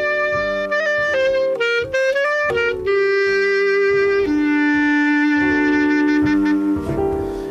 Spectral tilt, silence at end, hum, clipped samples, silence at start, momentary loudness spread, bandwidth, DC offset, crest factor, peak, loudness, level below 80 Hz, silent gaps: -5.5 dB/octave; 0 s; none; under 0.1%; 0 s; 4 LU; 8 kHz; under 0.1%; 10 dB; -8 dBFS; -17 LUFS; -42 dBFS; none